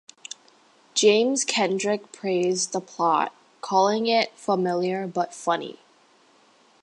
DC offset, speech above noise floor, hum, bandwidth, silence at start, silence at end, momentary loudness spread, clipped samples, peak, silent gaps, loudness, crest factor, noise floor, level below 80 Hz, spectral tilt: under 0.1%; 35 dB; none; 11.5 kHz; 0.95 s; 1.1 s; 16 LU; under 0.1%; -6 dBFS; none; -24 LUFS; 20 dB; -58 dBFS; -80 dBFS; -3 dB/octave